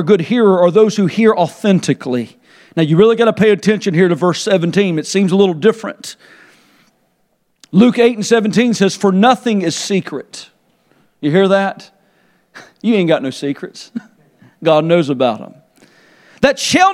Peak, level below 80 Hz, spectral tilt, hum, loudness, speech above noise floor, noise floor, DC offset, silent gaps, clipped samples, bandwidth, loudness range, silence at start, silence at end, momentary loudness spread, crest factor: 0 dBFS; -56 dBFS; -5.5 dB/octave; none; -13 LUFS; 49 dB; -62 dBFS; under 0.1%; none; under 0.1%; 13 kHz; 5 LU; 0 s; 0 s; 16 LU; 14 dB